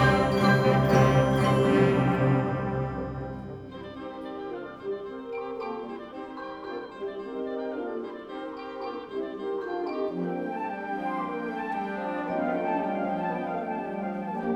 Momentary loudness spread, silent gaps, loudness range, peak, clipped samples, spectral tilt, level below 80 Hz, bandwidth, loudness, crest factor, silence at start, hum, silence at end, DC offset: 16 LU; none; 12 LU; -8 dBFS; under 0.1%; -7.5 dB/octave; -50 dBFS; 14.5 kHz; -28 LUFS; 18 dB; 0 s; none; 0 s; under 0.1%